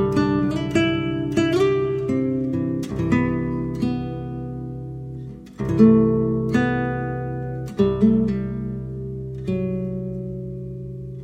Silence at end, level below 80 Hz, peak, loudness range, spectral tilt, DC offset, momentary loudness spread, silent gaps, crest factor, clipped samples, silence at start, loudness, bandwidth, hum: 0 s; -42 dBFS; -2 dBFS; 5 LU; -8 dB/octave; under 0.1%; 14 LU; none; 18 dB; under 0.1%; 0 s; -22 LUFS; 9.4 kHz; none